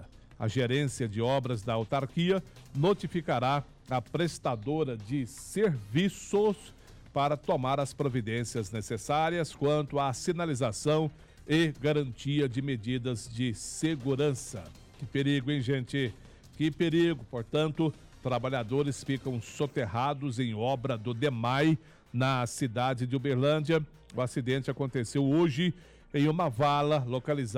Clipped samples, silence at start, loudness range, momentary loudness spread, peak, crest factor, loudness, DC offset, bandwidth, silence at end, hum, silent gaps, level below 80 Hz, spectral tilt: under 0.1%; 0 s; 2 LU; 8 LU; -18 dBFS; 12 dB; -31 LUFS; under 0.1%; 14.5 kHz; 0 s; none; none; -56 dBFS; -6 dB/octave